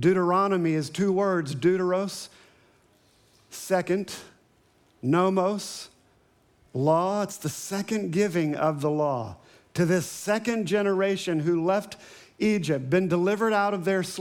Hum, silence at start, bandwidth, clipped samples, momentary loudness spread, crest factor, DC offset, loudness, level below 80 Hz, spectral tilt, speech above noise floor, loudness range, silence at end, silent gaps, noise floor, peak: none; 0 s; 18 kHz; under 0.1%; 13 LU; 16 dB; under 0.1%; -26 LUFS; -68 dBFS; -6 dB/octave; 38 dB; 4 LU; 0 s; none; -63 dBFS; -10 dBFS